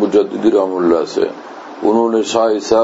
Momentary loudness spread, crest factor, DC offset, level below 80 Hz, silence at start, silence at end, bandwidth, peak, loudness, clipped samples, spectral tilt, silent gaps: 7 LU; 14 dB; under 0.1%; -56 dBFS; 0 s; 0 s; 8 kHz; 0 dBFS; -15 LUFS; under 0.1%; -5 dB/octave; none